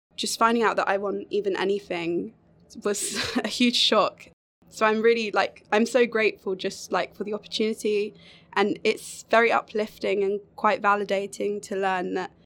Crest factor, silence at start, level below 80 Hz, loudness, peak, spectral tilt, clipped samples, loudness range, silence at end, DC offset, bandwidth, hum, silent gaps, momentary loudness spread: 20 dB; 0.2 s; -66 dBFS; -25 LUFS; -6 dBFS; -3 dB/octave; under 0.1%; 3 LU; 0.2 s; under 0.1%; 17.5 kHz; none; 4.33-4.62 s; 10 LU